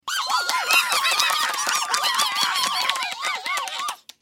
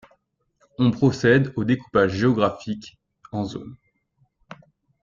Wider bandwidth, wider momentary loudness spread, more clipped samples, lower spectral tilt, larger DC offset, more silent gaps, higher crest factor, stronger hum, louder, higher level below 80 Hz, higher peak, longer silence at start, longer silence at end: first, 17 kHz vs 7.6 kHz; second, 8 LU vs 16 LU; neither; second, 2.5 dB/octave vs -7 dB/octave; neither; neither; about the same, 22 dB vs 20 dB; neither; about the same, -21 LUFS vs -22 LUFS; second, -80 dBFS vs -54 dBFS; about the same, -2 dBFS vs -4 dBFS; second, 0.05 s vs 0.8 s; second, 0.25 s vs 1.3 s